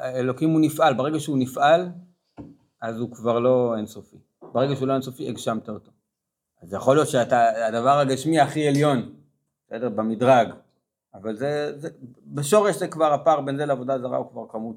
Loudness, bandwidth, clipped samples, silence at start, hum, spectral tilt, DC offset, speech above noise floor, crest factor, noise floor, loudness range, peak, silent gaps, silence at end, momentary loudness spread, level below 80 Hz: -22 LUFS; 16.5 kHz; under 0.1%; 0 s; none; -6 dB/octave; under 0.1%; 61 dB; 18 dB; -83 dBFS; 4 LU; -4 dBFS; none; 0 s; 15 LU; -70 dBFS